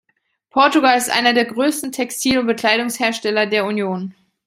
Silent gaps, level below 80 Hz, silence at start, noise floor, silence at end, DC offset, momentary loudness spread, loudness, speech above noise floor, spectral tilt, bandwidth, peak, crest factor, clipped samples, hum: none; -58 dBFS; 0.55 s; -66 dBFS; 0.35 s; under 0.1%; 9 LU; -17 LUFS; 49 dB; -3 dB/octave; 16 kHz; -2 dBFS; 16 dB; under 0.1%; none